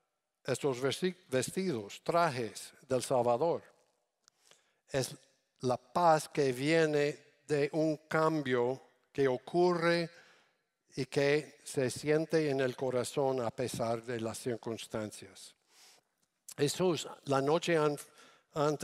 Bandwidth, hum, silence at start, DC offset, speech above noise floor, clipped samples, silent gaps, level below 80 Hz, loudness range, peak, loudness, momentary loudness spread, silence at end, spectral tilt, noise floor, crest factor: 15.5 kHz; none; 0.45 s; under 0.1%; 44 dB; under 0.1%; none; -72 dBFS; 5 LU; -14 dBFS; -33 LUFS; 12 LU; 0 s; -5 dB/octave; -77 dBFS; 18 dB